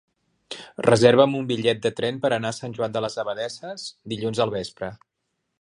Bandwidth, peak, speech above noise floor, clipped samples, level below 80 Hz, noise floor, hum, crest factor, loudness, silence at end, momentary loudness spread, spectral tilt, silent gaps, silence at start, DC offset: 11 kHz; -2 dBFS; 55 dB; under 0.1%; -60 dBFS; -78 dBFS; none; 22 dB; -23 LUFS; 0.65 s; 19 LU; -5 dB/octave; none; 0.5 s; under 0.1%